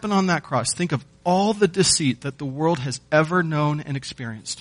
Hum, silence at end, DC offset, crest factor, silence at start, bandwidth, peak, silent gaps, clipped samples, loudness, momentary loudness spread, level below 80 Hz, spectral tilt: none; 0 s; under 0.1%; 18 dB; 0 s; 10.5 kHz; -4 dBFS; none; under 0.1%; -22 LUFS; 12 LU; -54 dBFS; -4.5 dB/octave